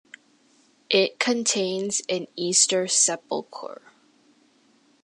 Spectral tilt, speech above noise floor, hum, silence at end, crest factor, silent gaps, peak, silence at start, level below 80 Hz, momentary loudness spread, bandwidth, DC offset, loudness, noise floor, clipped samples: -1.5 dB/octave; 37 dB; none; 1.3 s; 22 dB; none; -4 dBFS; 0.9 s; -80 dBFS; 13 LU; 11.5 kHz; under 0.1%; -22 LUFS; -61 dBFS; under 0.1%